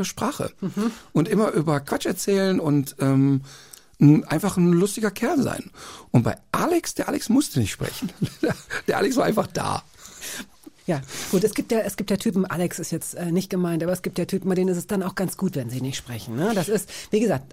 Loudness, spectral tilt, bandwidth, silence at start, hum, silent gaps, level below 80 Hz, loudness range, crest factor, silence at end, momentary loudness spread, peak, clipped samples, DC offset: -24 LUFS; -6 dB/octave; 16 kHz; 0 s; none; none; -54 dBFS; 5 LU; 18 dB; 0 s; 10 LU; -4 dBFS; under 0.1%; under 0.1%